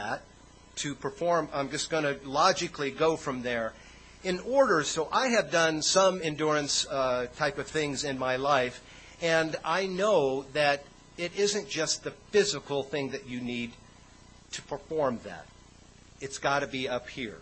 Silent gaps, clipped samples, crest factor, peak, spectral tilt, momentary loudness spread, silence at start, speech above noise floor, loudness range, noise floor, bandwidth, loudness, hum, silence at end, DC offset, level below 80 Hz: none; under 0.1%; 20 dB; -10 dBFS; -3 dB/octave; 13 LU; 0 s; 26 dB; 8 LU; -54 dBFS; 8.8 kHz; -29 LUFS; none; 0 s; under 0.1%; -58 dBFS